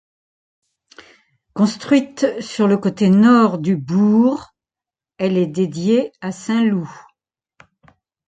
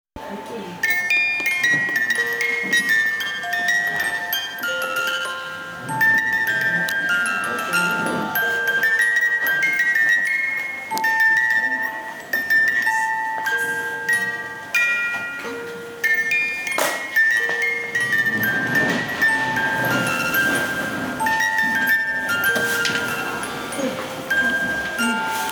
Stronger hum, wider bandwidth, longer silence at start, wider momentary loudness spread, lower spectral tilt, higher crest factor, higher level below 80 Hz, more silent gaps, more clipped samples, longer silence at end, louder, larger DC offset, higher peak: neither; second, 9.2 kHz vs over 20 kHz; first, 1.55 s vs 0.15 s; first, 12 LU vs 9 LU; first, -7 dB/octave vs -2.5 dB/octave; about the same, 16 dB vs 16 dB; about the same, -62 dBFS vs -58 dBFS; neither; neither; first, 1.3 s vs 0 s; about the same, -17 LUFS vs -19 LUFS; neither; first, -2 dBFS vs -6 dBFS